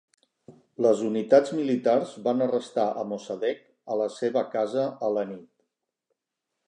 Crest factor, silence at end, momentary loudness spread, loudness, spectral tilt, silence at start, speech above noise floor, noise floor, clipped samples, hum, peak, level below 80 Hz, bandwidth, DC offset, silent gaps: 20 dB; 1.25 s; 12 LU; -26 LUFS; -6 dB/octave; 0.5 s; 59 dB; -84 dBFS; under 0.1%; none; -6 dBFS; -82 dBFS; 10 kHz; under 0.1%; none